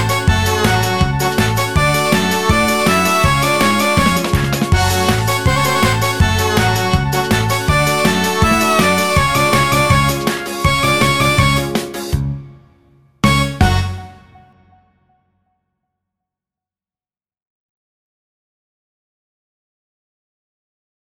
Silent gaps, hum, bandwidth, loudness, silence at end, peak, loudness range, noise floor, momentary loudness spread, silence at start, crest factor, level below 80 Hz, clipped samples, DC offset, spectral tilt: none; none; over 20 kHz; -14 LUFS; 6.7 s; 0 dBFS; 7 LU; under -90 dBFS; 5 LU; 0 s; 16 dB; -28 dBFS; under 0.1%; 1%; -4.5 dB/octave